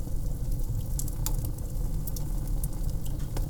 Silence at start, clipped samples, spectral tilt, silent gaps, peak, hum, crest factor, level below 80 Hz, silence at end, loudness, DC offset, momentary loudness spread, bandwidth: 0 s; under 0.1%; -5.5 dB/octave; none; -10 dBFS; none; 18 dB; -30 dBFS; 0 s; -34 LUFS; under 0.1%; 3 LU; over 20 kHz